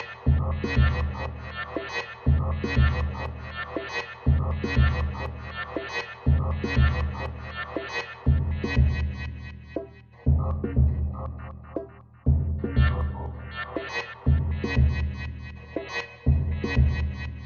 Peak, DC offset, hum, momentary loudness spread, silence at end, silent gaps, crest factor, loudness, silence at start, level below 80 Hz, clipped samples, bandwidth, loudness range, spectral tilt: -10 dBFS; under 0.1%; none; 12 LU; 0 s; none; 16 dB; -27 LUFS; 0 s; -30 dBFS; under 0.1%; 6.8 kHz; 2 LU; -7.5 dB/octave